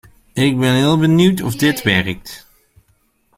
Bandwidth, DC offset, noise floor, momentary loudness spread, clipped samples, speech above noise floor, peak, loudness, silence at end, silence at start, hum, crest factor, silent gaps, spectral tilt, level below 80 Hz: 16.5 kHz; under 0.1%; -60 dBFS; 15 LU; under 0.1%; 45 dB; -2 dBFS; -15 LUFS; 1 s; 0.35 s; none; 16 dB; none; -5.5 dB/octave; -46 dBFS